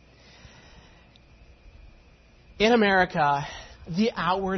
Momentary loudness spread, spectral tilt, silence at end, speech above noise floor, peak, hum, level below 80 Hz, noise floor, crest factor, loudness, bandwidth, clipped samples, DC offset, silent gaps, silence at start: 15 LU; -5.5 dB/octave; 0 s; 32 dB; -10 dBFS; none; -52 dBFS; -55 dBFS; 18 dB; -23 LUFS; 6.4 kHz; under 0.1%; under 0.1%; none; 1.65 s